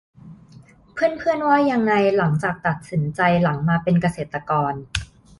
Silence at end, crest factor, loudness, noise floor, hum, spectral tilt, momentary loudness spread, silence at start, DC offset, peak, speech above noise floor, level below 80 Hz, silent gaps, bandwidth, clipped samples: 0.35 s; 18 dB; -20 LUFS; -48 dBFS; none; -7 dB/octave; 9 LU; 0.25 s; under 0.1%; -4 dBFS; 28 dB; -46 dBFS; none; 11.5 kHz; under 0.1%